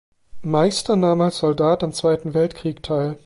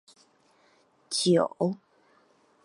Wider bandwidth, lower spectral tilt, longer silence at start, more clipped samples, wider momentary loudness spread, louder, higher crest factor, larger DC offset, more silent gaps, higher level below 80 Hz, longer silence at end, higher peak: about the same, 11.5 kHz vs 11.5 kHz; about the same, -6 dB/octave vs -5 dB/octave; second, 0.35 s vs 1.1 s; neither; second, 6 LU vs 10 LU; first, -20 LUFS vs -26 LUFS; second, 14 dB vs 20 dB; neither; neither; first, -50 dBFS vs -78 dBFS; second, 0.1 s vs 0.9 s; first, -6 dBFS vs -10 dBFS